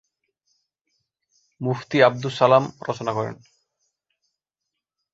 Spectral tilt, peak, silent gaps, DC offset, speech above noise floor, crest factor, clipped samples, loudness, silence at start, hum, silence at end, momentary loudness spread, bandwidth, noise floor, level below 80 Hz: -6 dB/octave; -2 dBFS; none; under 0.1%; 63 dB; 24 dB; under 0.1%; -21 LUFS; 1.6 s; none; 1.8 s; 12 LU; 8 kHz; -84 dBFS; -66 dBFS